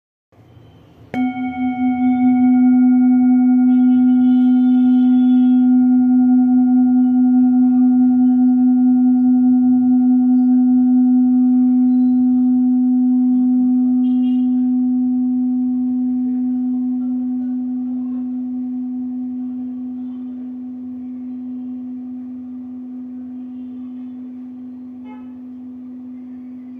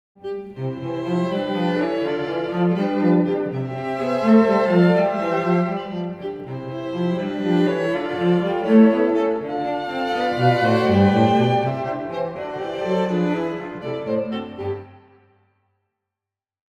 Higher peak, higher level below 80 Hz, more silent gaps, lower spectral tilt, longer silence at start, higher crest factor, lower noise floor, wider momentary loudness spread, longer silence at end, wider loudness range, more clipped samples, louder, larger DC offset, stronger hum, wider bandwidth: second, -8 dBFS vs -4 dBFS; about the same, -64 dBFS vs -60 dBFS; neither; first, -9.5 dB/octave vs -8 dB/octave; first, 1.15 s vs 0.25 s; second, 8 dB vs 18 dB; second, -45 dBFS vs -89 dBFS; first, 18 LU vs 13 LU; second, 0 s vs 1.8 s; first, 17 LU vs 7 LU; neither; first, -15 LUFS vs -21 LUFS; neither; neither; second, 3.3 kHz vs 8.6 kHz